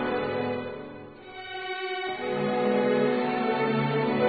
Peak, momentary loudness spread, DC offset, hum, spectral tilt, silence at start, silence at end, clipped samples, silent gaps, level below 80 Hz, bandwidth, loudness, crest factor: -12 dBFS; 16 LU; under 0.1%; none; -10.5 dB/octave; 0 s; 0 s; under 0.1%; none; -64 dBFS; 4.8 kHz; -27 LUFS; 16 dB